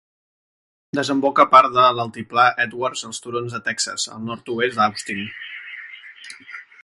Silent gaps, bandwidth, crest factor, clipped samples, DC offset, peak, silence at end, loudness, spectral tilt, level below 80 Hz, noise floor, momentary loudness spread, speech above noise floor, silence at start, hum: none; 11.5 kHz; 20 dB; under 0.1%; under 0.1%; 0 dBFS; 0.2 s; -19 LUFS; -3 dB/octave; -64 dBFS; -41 dBFS; 23 LU; 21 dB; 0.95 s; none